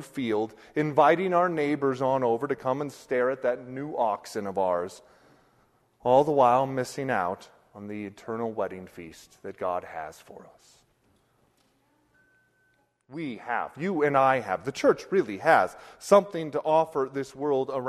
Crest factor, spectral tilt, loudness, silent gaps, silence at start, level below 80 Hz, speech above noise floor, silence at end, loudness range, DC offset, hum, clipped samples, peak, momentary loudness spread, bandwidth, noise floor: 22 dB; -6 dB/octave; -26 LUFS; none; 0 s; -68 dBFS; 42 dB; 0 s; 15 LU; under 0.1%; none; under 0.1%; -6 dBFS; 17 LU; 13.5 kHz; -69 dBFS